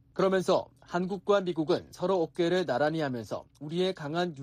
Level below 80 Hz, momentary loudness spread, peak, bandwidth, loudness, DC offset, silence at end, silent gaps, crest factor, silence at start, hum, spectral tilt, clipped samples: -66 dBFS; 8 LU; -14 dBFS; 14.5 kHz; -30 LUFS; under 0.1%; 0 s; none; 16 dB; 0.15 s; none; -6 dB/octave; under 0.1%